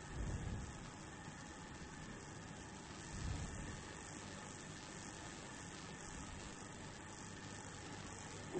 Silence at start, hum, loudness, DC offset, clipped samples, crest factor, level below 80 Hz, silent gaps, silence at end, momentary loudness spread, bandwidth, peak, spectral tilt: 0 s; none; -50 LUFS; under 0.1%; under 0.1%; 18 dB; -56 dBFS; none; 0 s; 6 LU; 8.4 kHz; -32 dBFS; -4 dB/octave